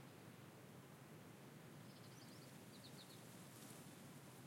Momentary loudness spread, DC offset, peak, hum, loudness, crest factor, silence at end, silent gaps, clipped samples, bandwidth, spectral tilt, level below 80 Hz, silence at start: 3 LU; under 0.1%; -46 dBFS; none; -60 LUFS; 14 dB; 0 s; none; under 0.1%; 16.5 kHz; -4.5 dB/octave; under -90 dBFS; 0 s